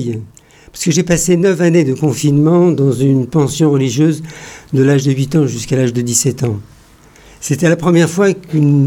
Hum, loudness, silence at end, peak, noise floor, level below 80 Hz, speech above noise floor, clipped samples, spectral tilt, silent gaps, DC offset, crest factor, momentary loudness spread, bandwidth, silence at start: none; -13 LUFS; 0 s; 0 dBFS; -43 dBFS; -44 dBFS; 31 dB; under 0.1%; -6 dB/octave; none; under 0.1%; 12 dB; 9 LU; 17 kHz; 0 s